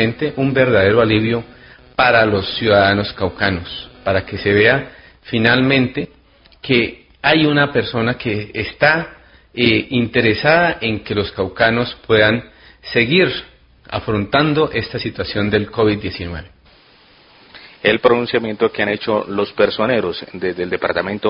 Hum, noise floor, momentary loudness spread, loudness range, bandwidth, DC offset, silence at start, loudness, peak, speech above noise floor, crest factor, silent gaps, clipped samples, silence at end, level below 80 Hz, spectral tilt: none; -49 dBFS; 11 LU; 4 LU; 5.4 kHz; under 0.1%; 0 s; -16 LUFS; 0 dBFS; 33 dB; 18 dB; none; under 0.1%; 0 s; -42 dBFS; -9 dB/octave